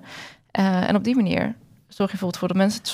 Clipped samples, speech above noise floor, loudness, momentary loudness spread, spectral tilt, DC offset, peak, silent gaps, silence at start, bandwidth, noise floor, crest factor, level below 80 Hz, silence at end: under 0.1%; 20 dB; -23 LUFS; 15 LU; -6 dB/octave; under 0.1%; -8 dBFS; none; 0.05 s; 15 kHz; -42 dBFS; 16 dB; -58 dBFS; 0 s